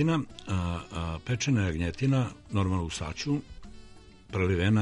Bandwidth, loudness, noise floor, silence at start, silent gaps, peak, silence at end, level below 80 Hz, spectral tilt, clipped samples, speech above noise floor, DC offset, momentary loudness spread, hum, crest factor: 11.5 kHz; -30 LUFS; -50 dBFS; 0 s; none; -14 dBFS; 0 s; -46 dBFS; -6 dB/octave; under 0.1%; 22 dB; under 0.1%; 8 LU; none; 14 dB